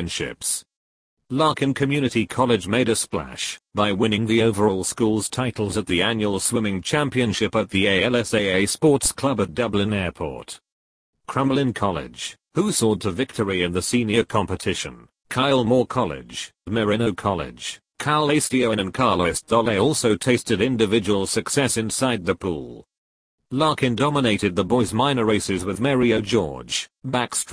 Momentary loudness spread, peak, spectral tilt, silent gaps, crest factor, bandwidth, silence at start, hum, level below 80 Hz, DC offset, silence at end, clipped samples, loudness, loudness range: 9 LU; -4 dBFS; -4.5 dB/octave; 0.76-1.17 s, 10.72-11.13 s, 22.98-23.38 s; 18 dB; 11 kHz; 0 s; none; -48 dBFS; under 0.1%; 0 s; under 0.1%; -21 LUFS; 3 LU